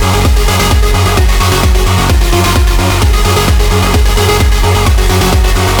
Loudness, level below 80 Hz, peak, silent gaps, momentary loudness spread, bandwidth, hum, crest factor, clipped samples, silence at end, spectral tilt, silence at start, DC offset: -10 LUFS; -10 dBFS; 0 dBFS; none; 1 LU; over 20 kHz; none; 8 dB; under 0.1%; 0 s; -4.5 dB/octave; 0 s; under 0.1%